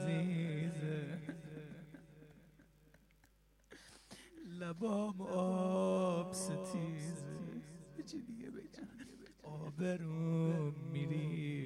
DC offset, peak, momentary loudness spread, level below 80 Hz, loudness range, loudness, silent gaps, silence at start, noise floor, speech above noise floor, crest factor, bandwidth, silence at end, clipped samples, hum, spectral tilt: under 0.1%; -24 dBFS; 20 LU; -72 dBFS; 13 LU; -40 LUFS; none; 0 s; -70 dBFS; 30 dB; 16 dB; 13 kHz; 0 s; under 0.1%; none; -7 dB/octave